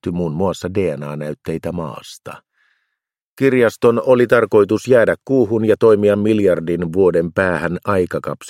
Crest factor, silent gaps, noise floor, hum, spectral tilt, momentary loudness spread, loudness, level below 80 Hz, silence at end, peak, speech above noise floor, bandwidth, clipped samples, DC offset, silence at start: 16 dB; 3.22-3.37 s; -78 dBFS; none; -7 dB/octave; 13 LU; -16 LUFS; -50 dBFS; 0 s; 0 dBFS; 63 dB; 15.5 kHz; under 0.1%; under 0.1%; 0.05 s